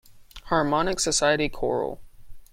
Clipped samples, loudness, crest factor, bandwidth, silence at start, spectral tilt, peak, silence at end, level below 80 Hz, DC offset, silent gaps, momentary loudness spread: under 0.1%; -24 LUFS; 18 dB; 16.5 kHz; 0.1 s; -3 dB/octave; -8 dBFS; 0.05 s; -44 dBFS; under 0.1%; none; 9 LU